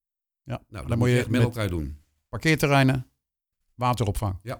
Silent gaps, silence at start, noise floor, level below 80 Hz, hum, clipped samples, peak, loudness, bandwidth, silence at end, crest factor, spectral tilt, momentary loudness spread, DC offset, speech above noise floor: none; 0.45 s; -81 dBFS; -42 dBFS; none; under 0.1%; -6 dBFS; -24 LUFS; 19 kHz; 0 s; 18 dB; -6 dB/octave; 17 LU; under 0.1%; 57 dB